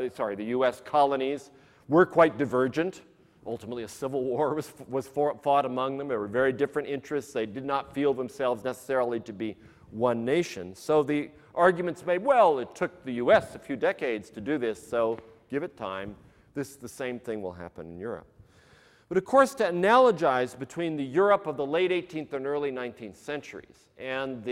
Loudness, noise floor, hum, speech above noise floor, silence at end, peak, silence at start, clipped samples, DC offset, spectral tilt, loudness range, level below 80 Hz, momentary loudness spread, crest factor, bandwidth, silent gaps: -28 LUFS; -58 dBFS; none; 31 dB; 0 s; -8 dBFS; 0 s; under 0.1%; under 0.1%; -6 dB/octave; 8 LU; -64 dBFS; 15 LU; 20 dB; 15.5 kHz; none